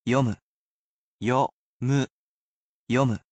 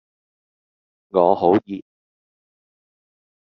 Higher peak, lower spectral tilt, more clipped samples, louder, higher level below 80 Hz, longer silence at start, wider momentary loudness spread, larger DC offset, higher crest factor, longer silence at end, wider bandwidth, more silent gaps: second, -10 dBFS vs -2 dBFS; about the same, -7 dB/octave vs -6.5 dB/octave; neither; second, -26 LUFS vs -18 LUFS; about the same, -62 dBFS vs -66 dBFS; second, 0.05 s vs 1.15 s; second, 8 LU vs 18 LU; neither; about the same, 18 dB vs 22 dB; second, 0.15 s vs 1.7 s; first, 8.6 kHz vs 6 kHz; first, 0.42-1.19 s, 1.52-1.80 s, 2.10-2.87 s vs none